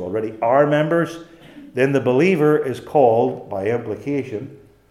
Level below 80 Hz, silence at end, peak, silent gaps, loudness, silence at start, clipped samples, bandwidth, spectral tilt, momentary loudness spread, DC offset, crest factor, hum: -60 dBFS; 0.35 s; -2 dBFS; none; -19 LUFS; 0 s; under 0.1%; 13 kHz; -7.5 dB/octave; 14 LU; under 0.1%; 18 dB; none